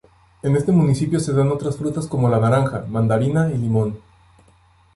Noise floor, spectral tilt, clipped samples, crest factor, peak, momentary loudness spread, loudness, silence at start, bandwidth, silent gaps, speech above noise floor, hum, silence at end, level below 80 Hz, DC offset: -54 dBFS; -8 dB/octave; under 0.1%; 14 dB; -6 dBFS; 7 LU; -19 LUFS; 0.45 s; 11.5 kHz; none; 36 dB; none; 1 s; -48 dBFS; under 0.1%